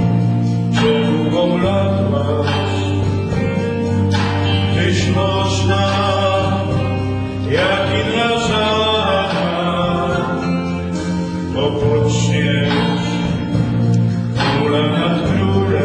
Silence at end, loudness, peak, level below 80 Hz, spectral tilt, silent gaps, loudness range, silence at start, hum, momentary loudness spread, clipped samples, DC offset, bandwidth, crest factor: 0 s; -16 LUFS; -4 dBFS; -38 dBFS; -6 dB/octave; none; 1 LU; 0 s; none; 4 LU; under 0.1%; under 0.1%; 10 kHz; 12 dB